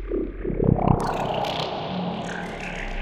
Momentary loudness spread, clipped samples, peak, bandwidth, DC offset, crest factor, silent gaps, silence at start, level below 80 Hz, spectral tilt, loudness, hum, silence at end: 10 LU; under 0.1%; -4 dBFS; 14 kHz; under 0.1%; 20 dB; none; 0 s; -36 dBFS; -6.5 dB/octave; -26 LUFS; none; 0 s